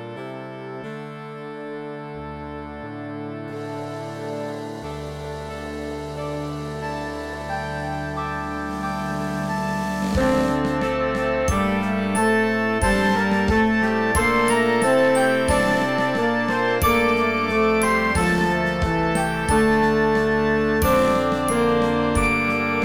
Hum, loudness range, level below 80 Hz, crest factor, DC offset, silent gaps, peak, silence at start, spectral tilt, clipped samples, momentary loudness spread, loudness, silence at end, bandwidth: none; 13 LU; -36 dBFS; 12 dB; 0.5%; none; -8 dBFS; 0 s; -5.5 dB/octave; under 0.1%; 15 LU; -21 LUFS; 0 s; over 20 kHz